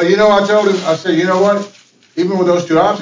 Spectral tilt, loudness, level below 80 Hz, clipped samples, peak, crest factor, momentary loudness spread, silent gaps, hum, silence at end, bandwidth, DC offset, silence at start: -5.5 dB/octave; -13 LUFS; -54 dBFS; under 0.1%; -2 dBFS; 12 dB; 9 LU; none; none; 0 s; 7.6 kHz; under 0.1%; 0 s